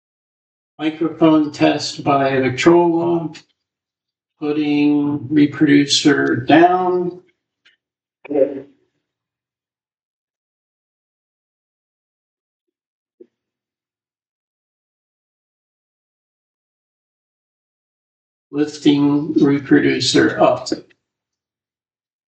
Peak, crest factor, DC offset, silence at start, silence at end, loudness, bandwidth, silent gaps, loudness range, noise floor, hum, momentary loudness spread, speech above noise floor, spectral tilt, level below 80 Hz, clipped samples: 0 dBFS; 20 dB; under 0.1%; 0.8 s; 1.45 s; -16 LUFS; 8.8 kHz; 10.03-12.67 s, 12.86-13.06 s, 13.14-13.18 s, 14.29-18.50 s; 12 LU; under -90 dBFS; none; 11 LU; over 75 dB; -5 dB/octave; -62 dBFS; under 0.1%